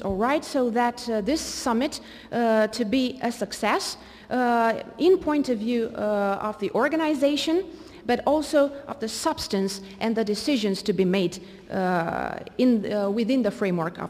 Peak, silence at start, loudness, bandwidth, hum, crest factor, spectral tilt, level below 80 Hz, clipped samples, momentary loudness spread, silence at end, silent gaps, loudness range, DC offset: -10 dBFS; 0 s; -25 LUFS; 15.5 kHz; none; 14 dB; -5 dB/octave; -54 dBFS; under 0.1%; 8 LU; 0 s; none; 2 LU; under 0.1%